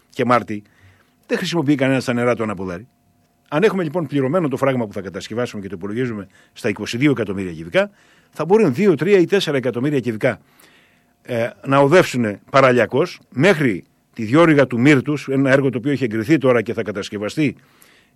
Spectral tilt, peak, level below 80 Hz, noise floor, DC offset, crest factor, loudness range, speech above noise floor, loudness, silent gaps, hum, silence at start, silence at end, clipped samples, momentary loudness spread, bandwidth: -6.5 dB/octave; -4 dBFS; -60 dBFS; -59 dBFS; under 0.1%; 14 dB; 6 LU; 42 dB; -18 LUFS; none; none; 0.15 s; 0.65 s; under 0.1%; 13 LU; 13.5 kHz